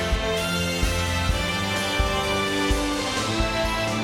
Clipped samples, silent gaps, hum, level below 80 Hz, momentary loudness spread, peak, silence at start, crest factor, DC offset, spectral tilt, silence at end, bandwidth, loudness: under 0.1%; none; none; -30 dBFS; 1 LU; -8 dBFS; 0 s; 16 dB; under 0.1%; -4 dB/octave; 0 s; 17 kHz; -24 LUFS